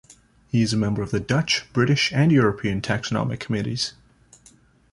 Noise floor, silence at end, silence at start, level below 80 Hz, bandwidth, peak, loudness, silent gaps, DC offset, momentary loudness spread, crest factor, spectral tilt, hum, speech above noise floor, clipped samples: -55 dBFS; 1 s; 0.55 s; -50 dBFS; 11.5 kHz; -6 dBFS; -22 LUFS; none; under 0.1%; 8 LU; 18 dB; -5.5 dB/octave; none; 33 dB; under 0.1%